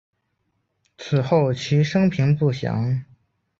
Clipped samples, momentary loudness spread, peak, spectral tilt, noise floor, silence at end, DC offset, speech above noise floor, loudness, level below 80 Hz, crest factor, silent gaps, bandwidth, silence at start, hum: under 0.1%; 7 LU; -6 dBFS; -7.5 dB/octave; -72 dBFS; 0.55 s; under 0.1%; 53 dB; -21 LUFS; -54 dBFS; 16 dB; none; 7.4 kHz; 1 s; none